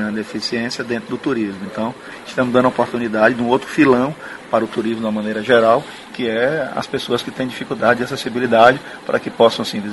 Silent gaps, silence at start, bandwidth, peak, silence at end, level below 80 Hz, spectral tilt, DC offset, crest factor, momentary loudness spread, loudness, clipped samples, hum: none; 0 s; 11.5 kHz; 0 dBFS; 0 s; -54 dBFS; -5.5 dB/octave; under 0.1%; 18 dB; 11 LU; -18 LUFS; under 0.1%; none